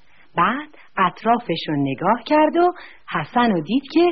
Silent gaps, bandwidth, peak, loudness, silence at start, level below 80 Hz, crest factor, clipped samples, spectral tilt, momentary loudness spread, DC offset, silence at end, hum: none; 6 kHz; -4 dBFS; -20 LUFS; 0.35 s; -56 dBFS; 16 dB; under 0.1%; -4 dB/octave; 11 LU; 0.5%; 0 s; none